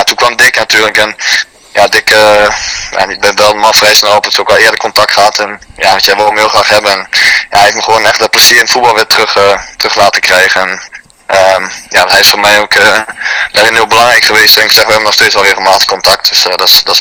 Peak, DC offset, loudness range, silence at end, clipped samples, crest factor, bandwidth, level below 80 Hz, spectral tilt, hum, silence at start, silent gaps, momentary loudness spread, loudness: 0 dBFS; under 0.1%; 3 LU; 0 s; 10%; 6 dB; over 20 kHz; -40 dBFS; -0.5 dB/octave; none; 0 s; none; 8 LU; -5 LUFS